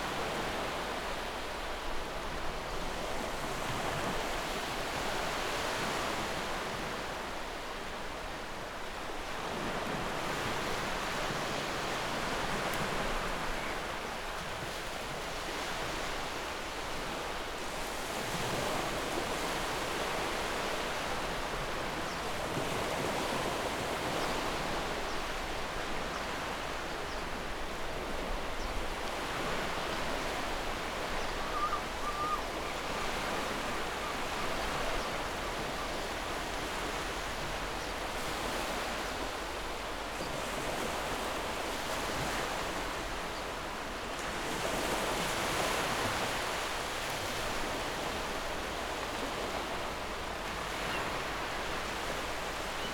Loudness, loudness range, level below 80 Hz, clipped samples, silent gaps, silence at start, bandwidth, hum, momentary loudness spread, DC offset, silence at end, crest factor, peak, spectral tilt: -35 LUFS; 3 LU; -46 dBFS; under 0.1%; none; 0 s; 19.5 kHz; none; 5 LU; under 0.1%; 0 s; 18 dB; -18 dBFS; -3 dB/octave